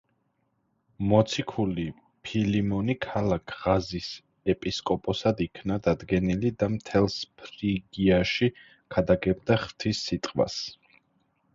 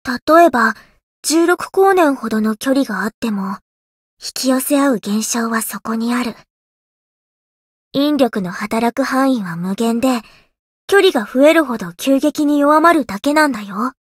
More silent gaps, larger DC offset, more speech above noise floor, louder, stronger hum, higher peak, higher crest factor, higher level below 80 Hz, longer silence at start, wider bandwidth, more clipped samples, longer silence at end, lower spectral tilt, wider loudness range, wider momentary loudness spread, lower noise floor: second, none vs 0.22-0.27 s, 1.03-1.23 s, 3.14-3.22 s, 3.62-4.17 s, 6.50-7.91 s, 10.59-10.88 s; neither; second, 47 dB vs over 75 dB; second, -27 LUFS vs -15 LUFS; neither; second, -8 dBFS vs 0 dBFS; about the same, 20 dB vs 16 dB; first, -48 dBFS vs -56 dBFS; first, 1 s vs 0.05 s; second, 7.6 kHz vs 16.5 kHz; neither; first, 0.8 s vs 0.15 s; first, -6.5 dB/octave vs -4 dB/octave; second, 2 LU vs 6 LU; about the same, 9 LU vs 11 LU; second, -73 dBFS vs under -90 dBFS